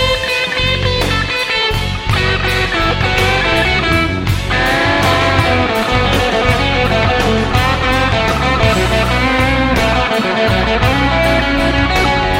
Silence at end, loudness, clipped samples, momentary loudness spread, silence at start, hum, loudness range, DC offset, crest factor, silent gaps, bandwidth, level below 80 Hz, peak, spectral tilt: 0 s; -13 LUFS; under 0.1%; 2 LU; 0 s; none; 1 LU; under 0.1%; 14 dB; none; 16.5 kHz; -22 dBFS; 0 dBFS; -5 dB/octave